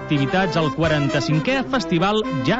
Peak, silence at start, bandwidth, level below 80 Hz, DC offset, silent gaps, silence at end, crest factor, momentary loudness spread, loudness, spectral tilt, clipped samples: -8 dBFS; 0 s; 8 kHz; -44 dBFS; under 0.1%; none; 0 s; 12 dB; 2 LU; -20 LUFS; -6 dB/octave; under 0.1%